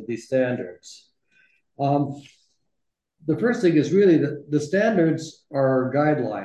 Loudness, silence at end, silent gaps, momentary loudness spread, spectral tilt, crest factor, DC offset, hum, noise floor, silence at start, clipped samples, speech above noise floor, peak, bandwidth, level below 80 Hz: -22 LUFS; 0 s; none; 12 LU; -7.5 dB/octave; 16 dB; under 0.1%; none; -79 dBFS; 0 s; under 0.1%; 58 dB; -8 dBFS; 9.8 kHz; -68 dBFS